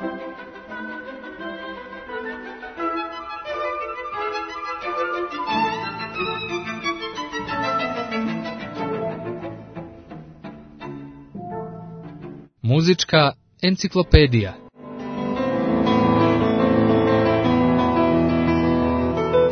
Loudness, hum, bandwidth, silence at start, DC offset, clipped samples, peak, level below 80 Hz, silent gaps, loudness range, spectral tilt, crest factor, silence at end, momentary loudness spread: -21 LUFS; none; 6.6 kHz; 0 s; under 0.1%; under 0.1%; 0 dBFS; -36 dBFS; none; 13 LU; -6.5 dB/octave; 22 dB; 0 s; 20 LU